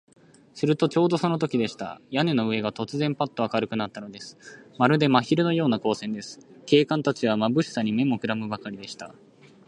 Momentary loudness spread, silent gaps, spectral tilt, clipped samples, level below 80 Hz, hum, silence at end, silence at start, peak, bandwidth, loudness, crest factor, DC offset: 17 LU; none; -6.5 dB/octave; under 0.1%; -68 dBFS; none; 0.55 s; 0.55 s; -2 dBFS; 10.5 kHz; -25 LUFS; 22 dB; under 0.1%